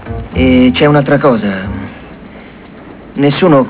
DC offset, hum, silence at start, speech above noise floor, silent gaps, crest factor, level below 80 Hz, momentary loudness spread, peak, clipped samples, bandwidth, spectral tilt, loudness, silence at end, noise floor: under 0.1%; none; 0 s; 24 dB; none; 10 dB; -30 dBFS; 23 LU; 0 dBFS; under 0.1%; 4 kHz; -11 dB/octave; -10 LUFS; 0 s; -32 dBFS